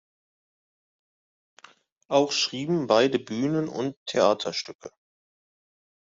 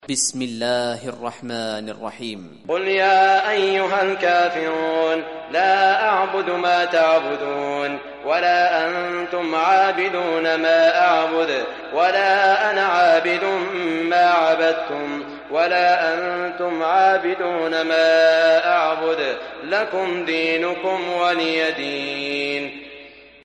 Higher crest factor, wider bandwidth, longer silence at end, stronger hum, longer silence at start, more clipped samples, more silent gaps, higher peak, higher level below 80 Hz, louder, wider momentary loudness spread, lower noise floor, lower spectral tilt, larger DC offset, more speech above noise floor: first, 22 dB vs 14 dB; second, 7.8 kHz vs 11.5 kHz; first, 1.3 s vs 0.25 s; neither; first, 2.1 s vs 0.05 s; neither; first, 3.97-4.06 s, 4.75-4.79 s vs none; about the same, -6 dBFS vs -6 dBFS; second, -72 dBFS vs -64 dBFS; second, -25 LUFS vs -19 LUFS; about the same, 10 LU vs 11 LU; first, -56 dBFS vs -43 dBFS; first, -4.5 dB/octave vs -2.5 dB/octave; neither; first, 31 dB vs 24 dB